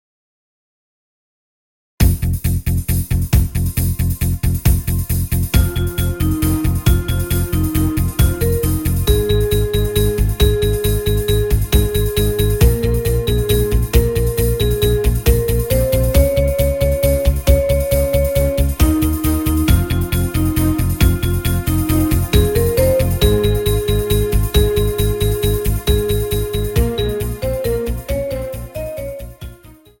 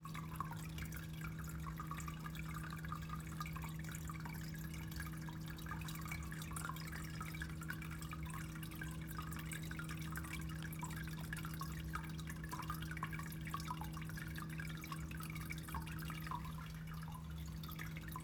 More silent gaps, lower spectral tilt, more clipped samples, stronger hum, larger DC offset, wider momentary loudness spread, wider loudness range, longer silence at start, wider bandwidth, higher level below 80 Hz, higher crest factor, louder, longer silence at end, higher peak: neither; about the same, -6 dB/octave vs -5 dB/octave; neither; neither; first, 0.4% vs under 0.1%; first, 5 LU vs 2 LU; about the same, 3 LU vs 1 LU; first, 2 s vs 0 s; second, 17 kHz vs over 20 kHz; first, -20 dBFS vs -54 dBFS; about the same, 16 dB vs 18 dB; first, -17 LUFS vs -47 LUFS; first, 0.3 s vs 0 s; first, 0 dBFS vs -28 dBFS